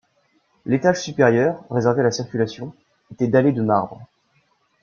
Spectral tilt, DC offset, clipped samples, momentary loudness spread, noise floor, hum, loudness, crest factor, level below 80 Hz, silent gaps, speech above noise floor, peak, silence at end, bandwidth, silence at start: -6.5 dB/octave; under 0.1%; under 0.1%; 13 LU; -64 dBFS; none; -20 LUFS; 18 dB; -60 dBFS; none; 45 dB; -2 dBFS; 0.75 s; 7.2 kHz; 0.65 s